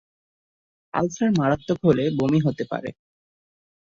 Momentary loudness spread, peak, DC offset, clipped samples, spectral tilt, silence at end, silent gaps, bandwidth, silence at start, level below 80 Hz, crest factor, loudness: 10 LU; -4 dBFS; under 0.1%; under 0.1%; -7 dB/octave; 1.05 s; none; 7.4 kHz; 0.95 s; -56 dBFS; 20 dB; -23 LUFS